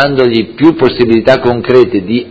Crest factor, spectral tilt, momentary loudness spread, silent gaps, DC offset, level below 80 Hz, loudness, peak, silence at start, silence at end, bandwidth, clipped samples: 8 dB; -7.5 dB/octave; 3 LU; none; under 0.1%; -38 dBFS; -9 LUFS; 0 dBFS; 0 s; 0 s; 8 kHz; 2%